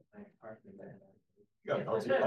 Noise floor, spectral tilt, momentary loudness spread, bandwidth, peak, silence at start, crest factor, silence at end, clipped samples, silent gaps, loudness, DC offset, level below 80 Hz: -71 dBFS; -6.5 dB/octave; 21 LU; 12 kHz; -18 dBFS; 0.15 s; 18 dB; 0 s; under 0.1%; none; -35 LUFS; under 0.1%; -84 dBFS